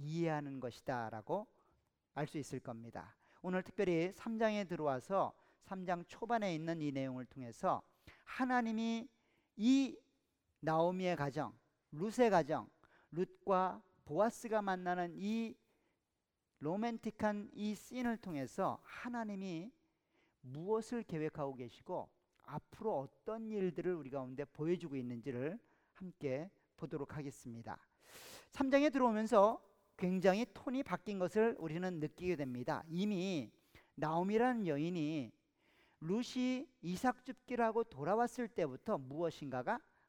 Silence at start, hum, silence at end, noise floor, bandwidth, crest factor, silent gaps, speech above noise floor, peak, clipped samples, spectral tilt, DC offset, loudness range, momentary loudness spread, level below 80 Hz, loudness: 0 s; none; 0.3 s; -88 dBFS; 17 kHz; 22 dB; none; 50 dB; -16 dBFS; under 0.1%; -6.5 dB/octave; under 0.1%; 8 LU; 16 LU; -74 dBFS; -39 LUFS